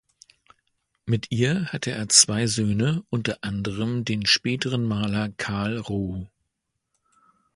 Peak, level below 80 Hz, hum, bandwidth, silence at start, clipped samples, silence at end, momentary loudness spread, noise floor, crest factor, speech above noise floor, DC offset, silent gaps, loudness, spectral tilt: -2 dBFS; -52 dBFS; none; 11.5 kHz; 1.05 s; under 0.1%; 1.3 s; 12 LU; -79 dBFS; 24 dB; 55 dB; under 0.1%; none; -23 LUFS; -3.5 dB/octave